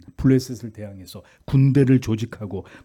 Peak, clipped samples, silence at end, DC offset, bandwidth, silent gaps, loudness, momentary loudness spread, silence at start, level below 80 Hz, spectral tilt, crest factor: -6 dBFS; under 0.1%; 0.2 s; under 0.1%; 14 kHz; none; -20 LUFS; 22 LU; 0.2 s; -44 dBFS; -8 dB/octave; 14 dB